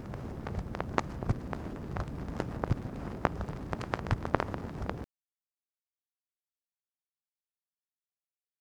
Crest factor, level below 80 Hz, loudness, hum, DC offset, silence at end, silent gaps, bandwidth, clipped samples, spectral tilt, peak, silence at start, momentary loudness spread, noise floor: 34 dB; -46 dBFS; -36 LUFS; none; under 0.1%; 3.55 s; none; 18.5 kHz; under 0.1%; -7.5 dB/octave; -4 dBFS; 0 s; 7 LU; under -90 dBFS